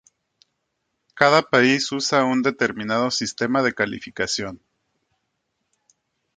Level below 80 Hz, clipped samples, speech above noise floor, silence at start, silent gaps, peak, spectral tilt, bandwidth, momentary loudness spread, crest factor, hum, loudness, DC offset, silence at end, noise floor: -62 dBFS; under 0.1%; 55 dB; 1.15 s; none; 0 dBFS; -3.5 dB/octave; 9.4 kHz; 9 LU; 24 dB; none; -20 LUFS; under 0.1%; 1.8 s; -76 dBFS